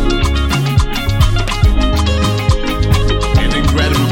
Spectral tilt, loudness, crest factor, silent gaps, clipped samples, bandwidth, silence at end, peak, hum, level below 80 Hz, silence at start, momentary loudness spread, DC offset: -5.5 dB/octave; -14 LUFS; 12 dB; none; under 0.1%; 17 kHz; 0 s; 0 dBFS; none; -16 dBFS; 0 s; 2 LU; under 0.1%